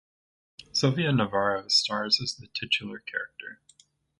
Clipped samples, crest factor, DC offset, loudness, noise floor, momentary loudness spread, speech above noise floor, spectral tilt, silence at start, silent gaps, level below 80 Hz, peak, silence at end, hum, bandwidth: under 0.1%; 20 dB; under 0.1%; -26 LUFS; -61 dBFS; 12 LU; 34 dB; -4 dB/octave; 0.6 s; none; -64 dBFS; -10 dBFS; 0.65 s; none; 11.5 kHz